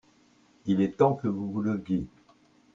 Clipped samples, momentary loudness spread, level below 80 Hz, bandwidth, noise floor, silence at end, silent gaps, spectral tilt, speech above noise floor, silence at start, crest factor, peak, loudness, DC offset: under 0.1%; 10 LU; -60 dBFS; 7.4 kHz; -62 dBFS; 0.65 s; none; -9 dB/octave; 35 dB; 0.65 s; 20 dB; -10 dBFS; -28 LUFS; under 0.1%